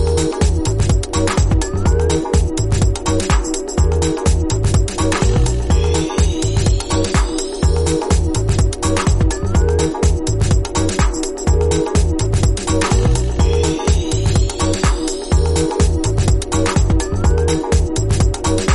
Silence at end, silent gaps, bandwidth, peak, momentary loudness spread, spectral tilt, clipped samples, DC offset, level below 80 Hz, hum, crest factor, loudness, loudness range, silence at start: 0 s; none; 11.5 kHz; -2 dBFS; 2 LU; -5.5 dB/octave; under 0.1%; under 0.1%; -18 dBFS; none; 12 dB; -17 LUFS; 0 LU; 0 s